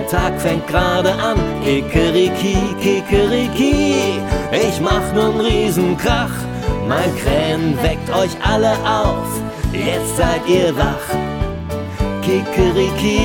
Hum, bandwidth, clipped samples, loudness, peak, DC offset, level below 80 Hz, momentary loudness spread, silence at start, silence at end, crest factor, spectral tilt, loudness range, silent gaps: none; 19 kHz; under 0.1%; -17 LUFS; 0 dBFS; under 0.1%; -26 dBFS; 7 LU; 0 s; 0 s; 16 dB; -5.5 dB/octave; 2 LU; none